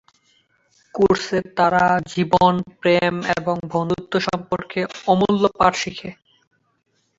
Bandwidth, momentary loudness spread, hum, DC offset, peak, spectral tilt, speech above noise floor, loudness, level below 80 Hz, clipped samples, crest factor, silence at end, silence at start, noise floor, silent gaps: 7.8 kHz; 9 LU; none; under 0.1%; -2 dBFS; -5.5 dB/octave; 43 dB; -19 LUFS; -50 dBFS; under 0.1%; 18 dB; 1.05 s; 0.95 s; -62 dBFS; none